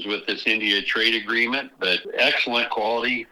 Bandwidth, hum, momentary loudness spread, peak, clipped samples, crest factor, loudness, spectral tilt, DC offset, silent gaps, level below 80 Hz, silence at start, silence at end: 14.5 kHz; none; 4 LU; -4 dBFS; under 0.1%; 20 dB; -21 LUFS; -3 dB/octave; under 0.1%; none; -64 dBFS; 0 s; 0.05 s